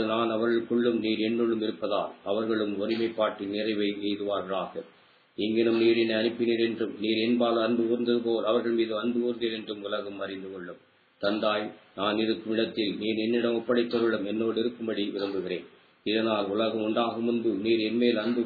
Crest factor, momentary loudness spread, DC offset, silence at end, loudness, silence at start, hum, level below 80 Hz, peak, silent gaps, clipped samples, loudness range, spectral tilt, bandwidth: 16 dB; 8 LU; under 0.1%; 0 s; -28 LUFS; 0 s; none; -74 dBFS; -12 dBFS; none; under 0.1%; 4 LU; -8 dB/octave; 4.9 kHz